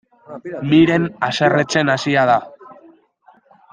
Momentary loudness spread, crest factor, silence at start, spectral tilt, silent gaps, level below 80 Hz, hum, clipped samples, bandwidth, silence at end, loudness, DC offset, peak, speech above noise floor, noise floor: 16 LU; 18 dB; 0.3 s; -5.5 dB/octave; none; -56 dBFS; none; under 0.1%; 9.4 kHz; 1 s; -16 LUFS; under 0.1%; 0 dBFS; 37 dB; -53 dBFS